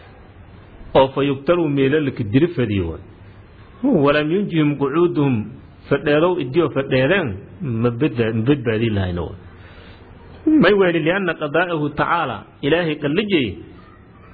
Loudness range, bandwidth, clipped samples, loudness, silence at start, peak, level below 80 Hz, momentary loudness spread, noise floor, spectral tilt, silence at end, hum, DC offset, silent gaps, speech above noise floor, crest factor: 2 LU; 4.9 kHz; under 0.1%; -19 LUFS; 0.4 s; 0 dBFS; -46 dBFS; 10 LU; -44 dBFS; -10.5 dB/octave; 0.55 s; none; under 0.1%; none; 26 dB; 18 dB